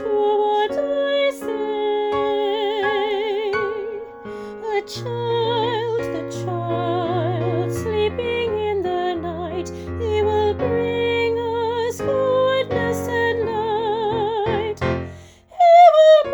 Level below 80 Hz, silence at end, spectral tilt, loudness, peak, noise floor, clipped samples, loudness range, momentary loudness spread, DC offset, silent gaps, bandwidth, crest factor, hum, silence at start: -48 dBFS; 0 s; -6 dB/octave; -20 LUFS; -2 dBFS; -41 dBFS; under 0.1%; 3 LU; 9 LU; under 0.1%; none; over 20 kHz; 18 dB; none; 0 s